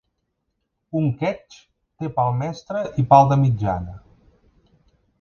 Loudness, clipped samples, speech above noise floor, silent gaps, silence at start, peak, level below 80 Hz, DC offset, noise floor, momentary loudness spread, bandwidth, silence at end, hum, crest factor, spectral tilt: -20 LUFS; under 0.1%; 56 dB; none; 0.95 s; 0 dBFS; -48 dBFS; under 0.1%; -75 dBFS; 15 LU; 7 kHz; 1.25 s; none; 22 dB; -8.5 dB/octave